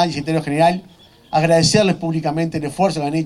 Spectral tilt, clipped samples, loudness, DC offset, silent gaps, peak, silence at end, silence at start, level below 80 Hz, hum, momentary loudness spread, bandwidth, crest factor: -5 dB/octave; under 0.1%; -17 LUFS; under 0.1%; none; 0 dBFS; 0 s; 0 s; -48 dBFS; none; 8 LU; 12.5 kHz; 18 dB